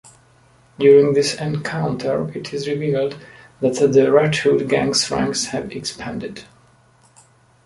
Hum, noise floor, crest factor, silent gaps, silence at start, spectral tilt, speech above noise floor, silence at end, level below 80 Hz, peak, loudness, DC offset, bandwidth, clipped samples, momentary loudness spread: none; -54 dBFS; 18 dB; none; 0.8 s; -4.5 dB/octave; 36 dB; 1.2 s; -54 dBFS; -2 dBFS; -18 LUFS; under 0.1%; 11.5 kHz; under 0.1%; 15 LU